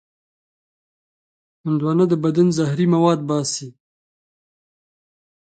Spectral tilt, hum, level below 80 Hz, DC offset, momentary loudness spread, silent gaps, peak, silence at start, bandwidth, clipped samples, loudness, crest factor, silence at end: -6.5 dB/octave; none; -66 dBFS; under 0.1%; 8 LU; none; -4 dBFS; 1.65 s; 9.2 kHz; under 0.1%; -19 LUFS; 18 dB; 1.8 s